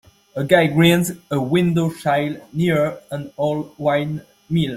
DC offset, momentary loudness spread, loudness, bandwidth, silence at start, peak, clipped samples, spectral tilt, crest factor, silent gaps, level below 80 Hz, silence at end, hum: under 0.1%; 13 LU; -19 LUFS; 15.5 kHz; 0.35 s; -2 dBFS; under 0.1%; -6 dB/octave; 18 dB; none; -54 dBFS; 0 s; none